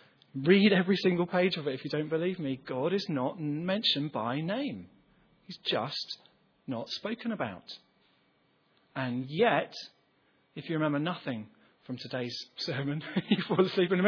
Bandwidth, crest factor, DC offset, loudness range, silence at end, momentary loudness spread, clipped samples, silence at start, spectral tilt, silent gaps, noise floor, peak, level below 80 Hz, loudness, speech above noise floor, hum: 5.4 kHz; 22 dB; under 0.1%; 8 LU; 0 s; 17 LU; under 0.1%; 0.35 s; -6.5 dB/octave; none; -70 dBFS; -8 dBFS; -76 dBFS; -31 LUFS; 39 dB; none